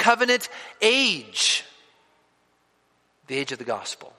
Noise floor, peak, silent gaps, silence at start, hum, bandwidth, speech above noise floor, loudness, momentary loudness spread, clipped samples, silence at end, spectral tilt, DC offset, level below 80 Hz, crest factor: -66 dBFS; -2 dBFS; none; 0 s; none; 15 kHz; 43 dB; -22 LUFS; 12 LU; under 0.1%; 0.1 s; -1 dB/octave; under 0.1%; -78 dBFS; 24 dB